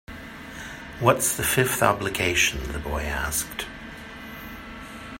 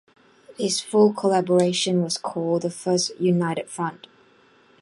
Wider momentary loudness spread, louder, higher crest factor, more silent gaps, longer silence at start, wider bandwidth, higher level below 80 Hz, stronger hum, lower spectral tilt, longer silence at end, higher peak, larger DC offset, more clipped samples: first, 18 LU vs 10 LU; about the same, -23 LUFS vs -22 LUFS; first, 26 dB vs 18 dB; neither; second, 0.1 s vs 0.5 s; first, 16.5 kHz vs 11.5 kHz; first, -40 dBFS vs -70 dBFS; neither; second, -3 dB/octave vs -5 dB/octave; second, 0 s vs 0.9 s; first, -2 dBFS vs -6 dBFS; neither; neither